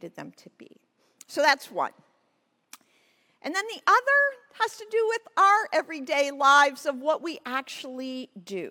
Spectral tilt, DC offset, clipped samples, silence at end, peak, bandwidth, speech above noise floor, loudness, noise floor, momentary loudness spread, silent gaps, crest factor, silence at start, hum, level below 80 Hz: -1.5 dB/octave; under 0.1%; under 0.1%; 0 s; -6 dBFS; 18 kHz; 46 dB; -24 LUFS; -72 dBFS; 17 LU; none; 20 dB; 0.05 s; none; -88 dBFS